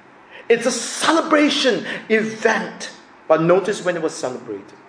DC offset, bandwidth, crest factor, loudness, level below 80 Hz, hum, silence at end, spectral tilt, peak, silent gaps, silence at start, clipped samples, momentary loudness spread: under 0.1%; 10.5 kHz; 18 dB; -18 LUFS; -68 dBFS; none; 0.25 s; -3.5 dB/octave; -2 dBFS; none; 0.3 s; under 0.1%; 14 LU